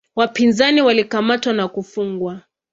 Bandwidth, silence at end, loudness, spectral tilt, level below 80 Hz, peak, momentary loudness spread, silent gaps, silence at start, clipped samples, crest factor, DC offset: 7.8 kHz; 0.35 s; -17 LUFS; -4.5 dB/octave; -60 dBFS; -2 dBFS; 12 LU; none; 0.15 s; under 0.1%; 16 dB; under 0.1%